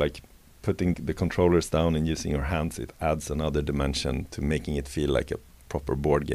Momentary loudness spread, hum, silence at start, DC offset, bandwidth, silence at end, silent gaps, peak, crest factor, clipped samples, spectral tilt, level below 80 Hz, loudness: 10 LU; none; 0 s; under 0.1%; 15.5 kHz; 0 s; none; -8 dBFS; 18 dB; under 0.1%; -6 dB/octave; -38 dBFS; -28 LUFS